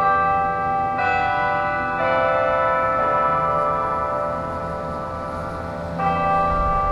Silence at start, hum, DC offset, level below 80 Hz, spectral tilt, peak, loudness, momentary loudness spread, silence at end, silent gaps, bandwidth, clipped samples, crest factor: 0 s; none; under 0.1%; -38 dBFS; -7 dB/octave; -6 dBFS; -21 LUFS; 9 LU; 0 s; none; 11.5 kHz; under 0.1%; 14 dB